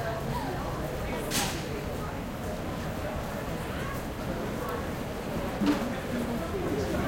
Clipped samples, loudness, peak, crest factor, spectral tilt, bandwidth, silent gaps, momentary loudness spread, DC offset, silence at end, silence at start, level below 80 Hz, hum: under 0.1%; -32 LUFS; -14 dBFS; 18 dB; -5 dB/octave; 17 kHz; none; 6 LU; under 0.1%; 0 s; 0 s; -42 dBFS; none